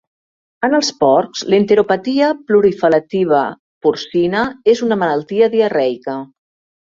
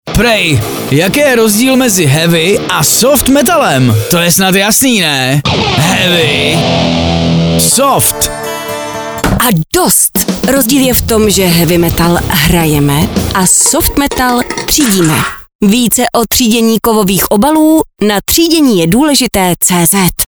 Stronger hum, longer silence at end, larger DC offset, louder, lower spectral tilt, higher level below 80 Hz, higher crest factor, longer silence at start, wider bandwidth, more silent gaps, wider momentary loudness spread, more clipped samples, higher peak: neither; first, 0.6 s vs 0.05 s; second, under 0.1% vs 0.4%; second, -15 LUFS vs -8 LUFS; first, -5 dB/octave vs -3.5 dB/octave; second, -56 dBFS vs -28 dBFS; first, 14 dB vs 8 dB; first, 0.6 s vs 0.05 s; second, 7.6 kHz vs over 20 kHz; first, 3.59-3.81 s vs 15.55-15.59 s; about the same, 6 LU vs 5 LU; second, under 0.1% vs 0.2%; about the same, -2 dBFS vs 0 dBFS